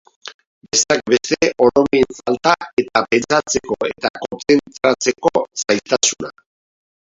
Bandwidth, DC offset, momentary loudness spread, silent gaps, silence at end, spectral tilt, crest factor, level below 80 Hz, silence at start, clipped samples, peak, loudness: 7.8 kHz; under 0.1%; 9 LU; 0.34-0.39 s, 0.47-0.61 s, 2.73-2.77 s, 4.10-4.14 s; 0.9 s; -2.5 dB/octave; 18 dB; -52 dBFS; 0.25 s; under 0.1%; 0 dBFS; -17 LUFS